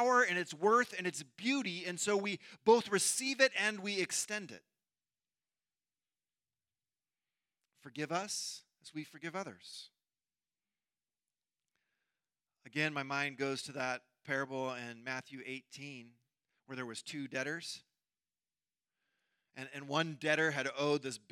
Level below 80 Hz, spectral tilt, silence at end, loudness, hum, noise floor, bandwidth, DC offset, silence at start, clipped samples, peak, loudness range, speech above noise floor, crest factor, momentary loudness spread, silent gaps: under -90 dBFS; -3 dB/octave; 0.15 s; -35 LUFS; none; under -90 dBFS; 16 kHz; under 0.1%; 0 s; under 0.1%; -14 dBFS; 15 LU; over 54 dB; 26 dB; 18 LU; none